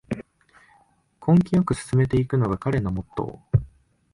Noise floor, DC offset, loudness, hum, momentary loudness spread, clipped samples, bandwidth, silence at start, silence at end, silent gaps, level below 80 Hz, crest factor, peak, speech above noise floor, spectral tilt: -61 dBFS; under 0.1%; -23 LUFS; none; 13 LU; under 0.1%; 11.5 kHz; 0.1 s; 0.5 s; none; -42 dBFS; 18 dB; -6 dBFS; 39 dB; -8.5 dB/octave